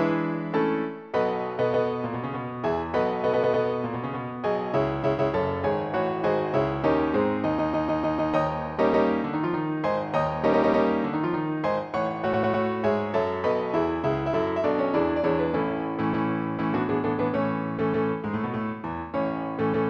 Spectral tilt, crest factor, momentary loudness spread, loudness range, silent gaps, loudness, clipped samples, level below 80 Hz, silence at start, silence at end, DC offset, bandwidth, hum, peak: -8.5 dB/octave; 16 dB; 6 LU; 2 LU; none; -26 LUFS; under 0.1%; -52 dBFS; 0 s; 0 s; under 0.1%; 7 kHz; none; -10 dBFS